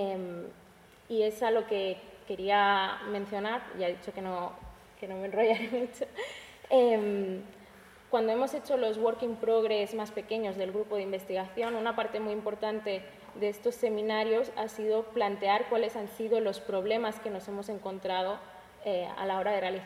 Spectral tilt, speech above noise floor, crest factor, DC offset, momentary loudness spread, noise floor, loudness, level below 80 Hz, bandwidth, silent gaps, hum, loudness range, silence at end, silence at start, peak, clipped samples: -5 dB/octave; 26 dB; 18 dB; under 0.1%; 11 LU; -57 dBFS; -31 LUFS; -66 dBFS; 16 kHz; none; none; 3 LU; 0 s; 0 s; -14 dBFS; under 0.1%